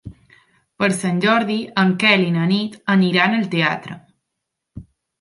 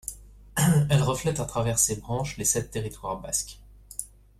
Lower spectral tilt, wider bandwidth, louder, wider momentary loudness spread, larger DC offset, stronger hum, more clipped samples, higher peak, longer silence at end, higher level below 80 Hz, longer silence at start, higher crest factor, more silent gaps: about the same, -5.5 dB/octave vs -4.5 dB/octave; second, 11.5 kHz vs 15.5 kHz; first, -17 LUFS vs -26 LUFS; second, 7 LU vs 15 LU; neither; second, none vs 50 Hz at -45 dBFS; neither; first, -2 dBFS vs -8 dBFS; about the same, 0.4 s vs 0.3 s; second, -56 dBFS vs -48 dBFS; about the same, 0.05 s vs 0.05 s; about the same, 18 dB vs 18 dB; neither